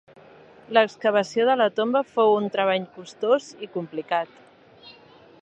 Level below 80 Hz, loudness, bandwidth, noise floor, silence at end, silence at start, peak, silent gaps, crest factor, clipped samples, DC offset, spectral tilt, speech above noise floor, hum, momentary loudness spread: -76 dBFS; -23 LUFS; 8.6 kHz; -51 dBFS; 0.5 s; 0.7 s; -2 dBFS; none; 22 dB; under 0.1%; under 0.1%; -5 dB/octave; 28 dB; none; 12 LU